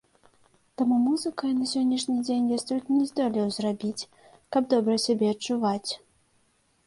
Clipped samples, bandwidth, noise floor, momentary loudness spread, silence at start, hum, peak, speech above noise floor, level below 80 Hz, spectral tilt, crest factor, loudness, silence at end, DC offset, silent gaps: under 0.1%; 11.5 kHz; -67 dBFS; 9 LU; 0.8 s; none; -10 dBFS; 42 dB; -70 dBFS; -5 dB/octave; 16 dB; -26 LUFS; 0.9 s; under 0.1%; none